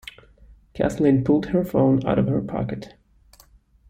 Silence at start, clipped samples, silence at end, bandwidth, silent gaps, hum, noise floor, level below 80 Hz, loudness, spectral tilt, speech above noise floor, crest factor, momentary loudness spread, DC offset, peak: 0.05 s; under 0.1%; 1 s; 16 kHz; none; none; -54 dBFS; -46 dBFS; -21 LUFS; -8.5 dB/octave; 34 dB; 16 dB; 14 LU; under 0.1%; -8 dBFS